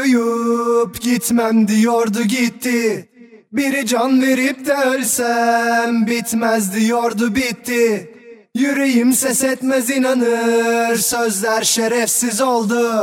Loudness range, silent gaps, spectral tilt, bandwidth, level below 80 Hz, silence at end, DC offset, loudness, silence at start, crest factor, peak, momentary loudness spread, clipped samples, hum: 2 LU; none; -3.5 dB/octave; 17.5 kHz; -56 dBFS; 0 s; under 0.1%; -16 LUFS; 0 s; 14 dB; -4 dBFS; 4 LU; under 0.1%; none